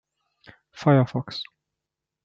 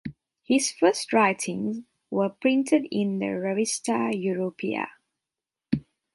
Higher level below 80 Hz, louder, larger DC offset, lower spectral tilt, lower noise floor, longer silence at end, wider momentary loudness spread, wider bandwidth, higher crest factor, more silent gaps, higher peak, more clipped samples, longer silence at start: second, -70 dBFS vs -64 dBFS; first, -23 LUFS vs -26 LUFS; neither; first, -8 dB/octave vs -4.5 dB/octave; about the same, -86 dBFS vs -89 dBFS; first, 0.8 s vs 0.35 s; first, 16 LU vs 10 LU; second, 7.2 kHz vs 11.5 kHz; about the same, 22 dB vs 18 dB; neither; first, -4 dBFS vs -8 dBFS; neither; first, 0.75 s vs 0.05 s